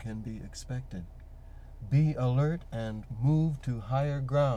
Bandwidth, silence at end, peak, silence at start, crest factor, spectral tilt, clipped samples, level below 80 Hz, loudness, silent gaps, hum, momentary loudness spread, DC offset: 9.4 kHz; 0 s; -14 dBFS; 0 s; 16 dB; -8.5 dB/octave; under 0.1%; -46 dBFS; -31 LUFS; none; none; 21 LU; under 0.1%